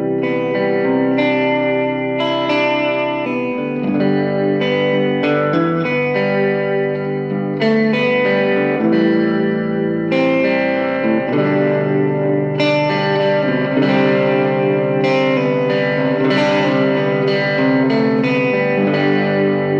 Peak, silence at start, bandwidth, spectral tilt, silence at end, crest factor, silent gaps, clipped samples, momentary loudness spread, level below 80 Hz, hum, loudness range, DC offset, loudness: -2 dBFS; 0 s; 7.2 kHz; -7.5 dB/octave; 0 s; 12 dB; none; under 0.1%; 4 LU; -68 dBFS; none; 2 LU; 0.1%; -16 LUFS